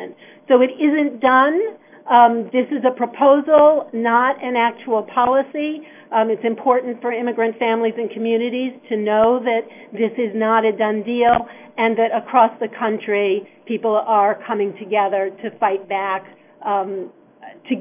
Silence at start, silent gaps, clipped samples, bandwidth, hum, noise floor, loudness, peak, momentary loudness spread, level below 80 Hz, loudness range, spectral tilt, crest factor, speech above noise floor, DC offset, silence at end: 0 s; none; under 0.1%; 3.7 kHz; none; -42 dBFS; -18 LUFS; -2 dBFS; 10 LU; -60 dBFS; 5 LU; -9 dB/octave; 16 dB; 24 dB; under 0.1%; 0 s